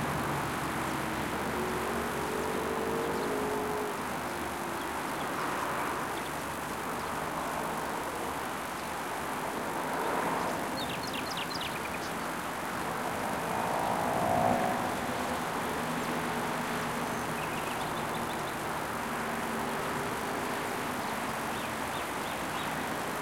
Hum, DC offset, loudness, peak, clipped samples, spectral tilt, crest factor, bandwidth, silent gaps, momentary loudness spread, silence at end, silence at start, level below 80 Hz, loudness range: none; under 0.1%; -33 LUFS; -16 dBFS; under 0.1%; -4 dB/octave; 18 dB; 17 kHz; none; 4 LU; 0 s; 0 s; -56 dBFS; 3 LU